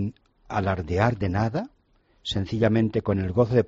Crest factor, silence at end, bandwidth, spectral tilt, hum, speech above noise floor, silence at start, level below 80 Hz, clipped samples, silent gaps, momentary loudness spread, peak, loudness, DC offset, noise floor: 18 dB; 0 s; 7.6 kHz; -6 dB/octave; none; 40 dB; 0 s; -46 dBFS; under 0.1%; none; 11 LU; -6 dBFS; -25 LUFS; under 0.1%; -63 dBFS